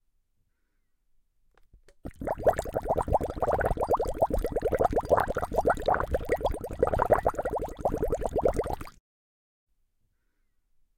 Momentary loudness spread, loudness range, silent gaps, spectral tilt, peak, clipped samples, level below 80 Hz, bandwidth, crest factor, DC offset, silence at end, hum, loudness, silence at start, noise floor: 8 LU; 6 LU; none; -6.5 dB/octave; -10 dBFS; under 0.1%; -40 dBFS; 17 kHz; 20 dB; under 0.1%; 2.05 s; none; -28 LUFS; 2.05 s; -73 dBFS